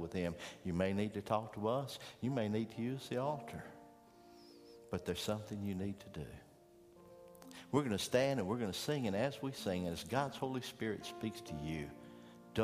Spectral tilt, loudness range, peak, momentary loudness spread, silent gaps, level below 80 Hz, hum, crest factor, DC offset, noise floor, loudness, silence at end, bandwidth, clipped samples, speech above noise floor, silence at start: -5.5 dB/octave; 7 LU; -18 dBFS; 20 LU; none; -66 dBFS; none; 22 dB; under 0.1%; -63 dBFS; -40 LUFS; 0 s; 15.5 kHz; under 0.1%; 24 dB; 0 s